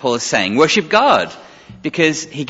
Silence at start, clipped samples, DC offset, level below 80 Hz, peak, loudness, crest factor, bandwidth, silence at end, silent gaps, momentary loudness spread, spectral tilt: 0 s; under 0.1%; under 0.1%; -54 dBFS; 0 dBFS; -14 LUFS; 16 dB; 8 kHz; 0 s; none; 12 LU; -3.5 dB/octave